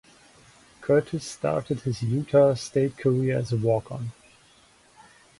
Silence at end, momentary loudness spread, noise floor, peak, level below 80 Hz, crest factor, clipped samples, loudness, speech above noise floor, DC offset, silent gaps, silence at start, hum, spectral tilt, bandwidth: 1.3 s; 14 LU; -57 dBFS; -8 dBFS; -58 dBFS; 18 dB; under 0.1%; -25 LUFS; 33 dB; under 0.1%; none; 0.8 s; none; -7 dB/octave; 11.5 kHz